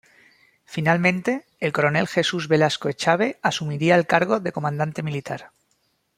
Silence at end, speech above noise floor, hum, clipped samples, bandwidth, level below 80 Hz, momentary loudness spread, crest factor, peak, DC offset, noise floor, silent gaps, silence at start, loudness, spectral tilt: 0.7 s; 47 dB; none; under 0.1%; 15.5 kHz; -62 dBFS; 9 LU; 20 dB; -2 dBFS; under 0.1%; -69 dBFS; none; 0.7 s; -22 LUFS; -5.5 dB/octave